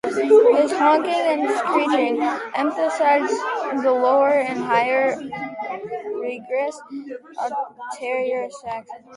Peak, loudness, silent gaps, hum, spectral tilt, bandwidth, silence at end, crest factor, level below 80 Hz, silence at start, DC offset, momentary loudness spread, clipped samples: -4 dBFS; -20 LUFS; none; none; -4 dB/octave; 11.5 kHz; 0 s; 16 dB; -70 dBFS; 0.05 s; under 0.1%; 14 LU; under 0.1%